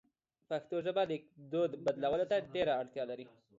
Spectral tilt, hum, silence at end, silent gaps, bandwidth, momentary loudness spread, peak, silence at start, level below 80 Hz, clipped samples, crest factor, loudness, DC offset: -4 dB/octave; none; 0.3 s; none; 7.6 kHz; 8 LU; -22 dBFS; 0.5 s; -72 dBFS; under 0.1%; 16 dB; -36 LUFS; under 0.1%